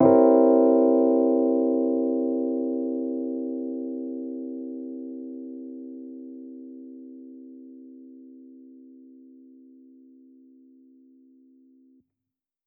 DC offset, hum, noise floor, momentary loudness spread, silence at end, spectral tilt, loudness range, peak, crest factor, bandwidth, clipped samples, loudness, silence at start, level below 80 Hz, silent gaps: under 0.1%; none; -88 dBFS; 26 LU; 4.25 s; -11.5 dB/octave; 25 LU; -6 dBFS; 20 dB; 2.5 kHz; under 0.1%; -23 LUFS; 0 s; -74 dBFS; none